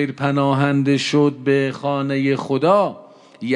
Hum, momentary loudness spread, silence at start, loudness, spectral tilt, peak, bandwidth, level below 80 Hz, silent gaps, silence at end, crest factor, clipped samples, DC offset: none; 5 LU; 0 s; -18 LUFS; -6.5 dB/octave; -2 dBFS; 10.5 kHz; -70 dBFS; none; 0 s; 16 dB; under 0.1%; under 0.1%